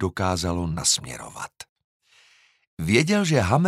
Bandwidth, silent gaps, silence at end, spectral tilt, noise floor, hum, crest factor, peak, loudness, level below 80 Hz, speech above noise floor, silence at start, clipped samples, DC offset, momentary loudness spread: 15.5 kHz; 1.69-1.76 s, 1.84-2.00 s, 2.67-2.77 s; 0 s; -4 dB/octave; -58 dBFS; none; 20 dB; -4 dBFS; -22 LUFS; -46 dBFS; 36 dB; 0 s; under 0.1%; under 0.1%; 17 LU